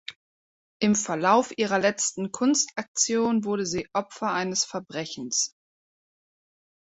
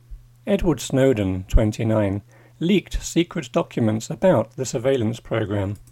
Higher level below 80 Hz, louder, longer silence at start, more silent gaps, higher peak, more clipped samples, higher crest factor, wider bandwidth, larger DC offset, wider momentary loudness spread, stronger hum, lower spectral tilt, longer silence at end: second, -66 dBFS vs -32 dBFS; second, -25 LUFS vs -22 LUFS; about the same, 0.1 s vs 0.1 s; first, 0.16-0.80 s, 2.88-2.95 s vs none; about the same, -6 dBFS vs -4 dBFS; neither; about the same, 20 dB vs 16 dB; second, 8.4 kHz vs 16.5 kHz; neither; about the same, 8 LU vs 7 LU; neither; second, -3 dB/octave vs -6 dB/octave; first, 1.35 s vs 0.1 s